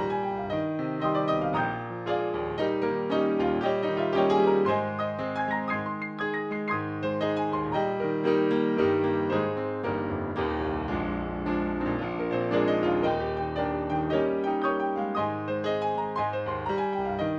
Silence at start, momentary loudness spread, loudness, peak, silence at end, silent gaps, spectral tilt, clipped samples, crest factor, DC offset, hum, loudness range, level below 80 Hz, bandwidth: 0 s; 6 LU; -28 LUFS; -12 dBFS; 0 s; none; -8 dB/octave; under 0.1%; 14 dB; under 0.1%; none; 3 LU; -50 dBFS; 7 kHz